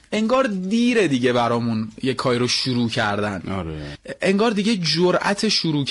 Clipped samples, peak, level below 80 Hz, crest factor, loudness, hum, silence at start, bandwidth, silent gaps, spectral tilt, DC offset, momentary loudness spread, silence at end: under 0.1%; -8 dBFS; -50 dBFS; 12 dB; -20 LUFS; none; 0.1 s; 11.5 kHz; none; -5 dB/octave; under 0.1%; 8 LU; 0 s